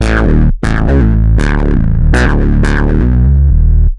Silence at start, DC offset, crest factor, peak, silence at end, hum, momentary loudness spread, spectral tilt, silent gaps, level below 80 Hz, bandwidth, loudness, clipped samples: 0 s; under 0.1%; 8 dB; 0 dBFS; 0 s; none; 3 LU; -7.5 dB/octave; none; -10 dBFS; 11 kHz; -11 LUFS; under 0.1%